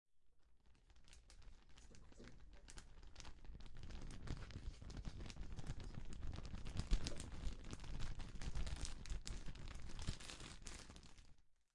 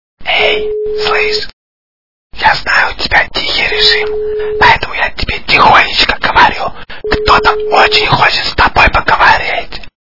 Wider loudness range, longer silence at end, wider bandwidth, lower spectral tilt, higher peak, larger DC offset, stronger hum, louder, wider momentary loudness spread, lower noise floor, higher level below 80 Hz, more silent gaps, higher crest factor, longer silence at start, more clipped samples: first, 12 LU vs 3 LU; first, 0.2 s vs 0.05 s; first, 11.5 kHz vs 6 kHz; about the same, -4.5 dB/octave vs -3.5 dB/octave; second, -22 dBFS vs 0 dBFS; second, under 0.1% vs 6%; neither; second, -53 LUFS vs -9 LUFS; first, 16 LU vs 10 LU; second, -68 dBFS vs under -90 dBFS; second, -52 dBFS vs -28 dBFS; second, none vs 1.53-2.30 s; first, 26 dB vs 12 dB; about the same, 0.15 s vs 0.15 s; second, under 0.1% vs 1%